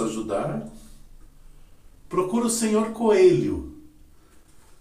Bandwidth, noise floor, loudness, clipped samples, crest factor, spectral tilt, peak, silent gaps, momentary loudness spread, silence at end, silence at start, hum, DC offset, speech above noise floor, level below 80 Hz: 15.5 kHz; -51 dBFS; -23 LUFS; under 0.1%; 18 dB; -5 dB/octave; -6 dBFS; none; 16 LU; 0.25 s; 0 s; none; under 0.1%; 30 dB; -48 dBFS